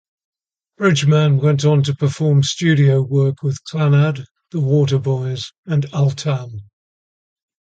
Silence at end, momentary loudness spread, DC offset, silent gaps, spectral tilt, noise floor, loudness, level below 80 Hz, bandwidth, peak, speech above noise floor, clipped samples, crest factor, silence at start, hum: 1.1 s; 11 LU; under 0.1%; 4.31-4.35 s, 5.58-5.63 s; -6.5 dB/octave; under -90 dBFS; -17 LUFS; -54 dBFS; 8.6 kHz; -2 dBFS; over 74 dB; under 0.1%; 14 dB; 0.8 s; none